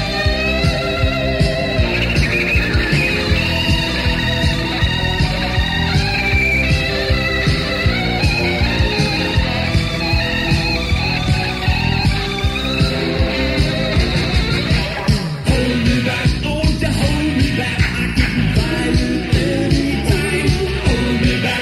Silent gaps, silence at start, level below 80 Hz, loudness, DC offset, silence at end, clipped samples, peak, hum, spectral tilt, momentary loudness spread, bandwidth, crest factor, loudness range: none; 0 s; -22 dBFS; -16 LUFS; under 0.1%; 0 s; under 0.1%; -2 dBFS; none; -5.5 dB/octave; 2 LU; 15 kHz; 14 dB; 1 LU